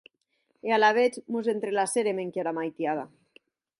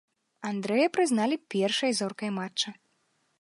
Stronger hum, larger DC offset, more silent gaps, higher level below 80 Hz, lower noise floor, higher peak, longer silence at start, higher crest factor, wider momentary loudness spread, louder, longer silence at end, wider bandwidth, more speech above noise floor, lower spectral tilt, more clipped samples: neither; neither; neither; about the same, -80 dBFS vs -82 dBFS; about the same, -74 dBFS vs -72 dBFS; about the same, -10 dBFS vs -12 dBFS; first, 0.65 s vs 0.4 s; about the same, 18 dB vs 18 dB; about the same, 10 LU vs 9 LU; about the same, -27 LUFS vs -28 LUFS; about the same, 0.75 s vs 0.7 s; about the same, 11.5 kHz vs 11.5 kHz; about the same, 48 dB vs 45 dB; about the same, -3.5 dB/octave vs -4 dB/octave; neither